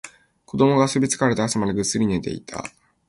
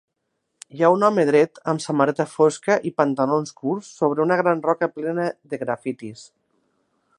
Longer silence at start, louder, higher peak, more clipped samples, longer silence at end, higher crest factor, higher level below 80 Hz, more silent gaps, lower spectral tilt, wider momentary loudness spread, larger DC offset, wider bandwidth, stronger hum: second, 0.05 s vs 0.75 s; about the same, -21 LUFS vs -21 LUFS; about the same, -4 dBFS vs -2 dBFS; neither; second, 0.4 s vs 0.95 s; about the same, 18 dB vs 20 dB; first, -50 dBFS vs -74 dBFS; neither; about the same, -5 dB/octave vs -6 dB/octave; first, 16 LU vs 10 LU; neither; about the same, 11.5 kHz vs 11 kHz; neither